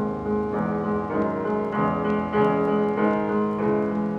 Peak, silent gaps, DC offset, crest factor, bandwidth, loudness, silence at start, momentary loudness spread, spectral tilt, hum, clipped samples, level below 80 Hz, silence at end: -10 dBFS; none; under 0.1%; 12 dB; 5.6 kHz; -24 LUFS; 0 s; 4 LU; -9 dB/octave; none; under 0.1%; -50 dBFS; 0 s